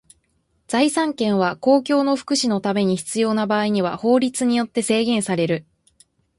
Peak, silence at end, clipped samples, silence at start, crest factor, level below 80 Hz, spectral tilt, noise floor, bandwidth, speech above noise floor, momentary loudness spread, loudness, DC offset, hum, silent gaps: -4 dBFS; 0.75 s; under 0.1%; 0.7 s; 16 dB; -62 dBFS; -4.5 dB/octave; -67 dBFS; 11.5 kHz; 47 dB; 4 LU; -20 LUFS; under 0.1%; none; none